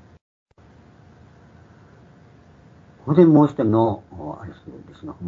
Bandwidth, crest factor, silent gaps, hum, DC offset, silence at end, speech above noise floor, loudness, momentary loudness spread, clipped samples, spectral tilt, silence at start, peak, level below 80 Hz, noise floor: 7 kHz; 20 dB; none; none; under 0.1%; 0 s; 32 dB; -17 LUFS; 25 LU; under 0.1%; -10.5 dB/octave; 3.05 s; -2 dBFS; -58 dBFS; -50 dBFS